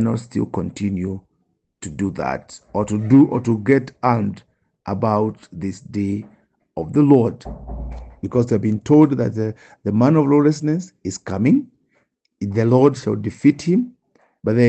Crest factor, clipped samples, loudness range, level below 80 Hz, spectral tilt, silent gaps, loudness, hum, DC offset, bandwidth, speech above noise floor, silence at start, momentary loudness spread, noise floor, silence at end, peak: 18 dB; under 0.1%; 4 LU; -44 dBFS; -8 dB/octave; none; -19 LUFS; none; under 0.1%; 8.6 kHz; 50 dB; 0 s; 17 LU; -68 dBFS; 0 s; -2 dBFS